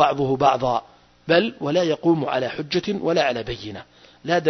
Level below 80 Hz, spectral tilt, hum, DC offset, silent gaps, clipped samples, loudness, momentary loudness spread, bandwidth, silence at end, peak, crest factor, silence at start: -52 dBFS; -6 dB/octave; none; under 0.1%; none; under 0.1%; -21 LUFS; 14 LU; 6.4 kHz; 0 s; -2 dBFS; 20 dB; 0 s